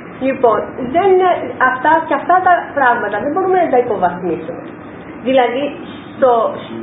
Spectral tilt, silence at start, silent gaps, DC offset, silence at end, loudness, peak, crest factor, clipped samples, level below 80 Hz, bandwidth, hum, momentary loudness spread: -9.5 dB/octave; 0 s; none; under 0.1%; 0 s; -14 LUFS; 0 dBFS; 14 dB; under 0.1%; -52 dBFS; 4 kHz; none; 15 LU